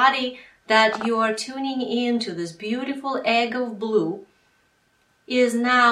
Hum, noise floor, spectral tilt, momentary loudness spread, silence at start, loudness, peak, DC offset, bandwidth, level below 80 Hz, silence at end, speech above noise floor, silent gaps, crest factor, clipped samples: none; -64 dBFS; -3.5 dB/octave; 11 LU; 0 s; -22 LUFS; -2 dBFS; under 0.1%; 13 kHz; -70 dBFS; 0 s; 42 dB; none; 20 dB; under 0.1%